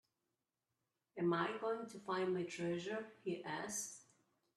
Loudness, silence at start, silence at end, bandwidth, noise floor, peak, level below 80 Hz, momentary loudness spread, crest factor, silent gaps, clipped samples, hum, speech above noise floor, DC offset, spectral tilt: -42 LUFS; 1.15 s; 0.55 s; 13.5 kHz; under -90 dBFS; -24 dBFS; -86 dBFS; 8 LU; 20 dB; none; under 0.1%; none; over 49 dB; under 0.1%; -4.5 dB/octave